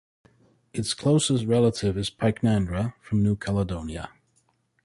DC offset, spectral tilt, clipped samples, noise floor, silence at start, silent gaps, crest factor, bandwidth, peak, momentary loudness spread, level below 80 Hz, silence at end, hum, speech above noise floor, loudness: under 0.1%; -6 dB/octave; under 0.1%; -68 dBFS; 0.75 s; none; 16 dB; 11.5 kHz; -10 dBFS; 12 LU; -46 dBFS; 0.75 s; none; 44 dB; -25 LUFS